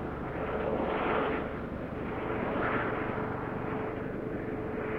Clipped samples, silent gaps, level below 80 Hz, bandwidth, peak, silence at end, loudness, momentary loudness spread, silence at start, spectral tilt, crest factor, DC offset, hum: under 0.1%; none; -48 dBFS; 6.6 kHz; -18 dBFS; 0 s; -33 LUFS; 6 LU; 0 s; -8.5 dB/octave; 14 dB; under 0.1%; none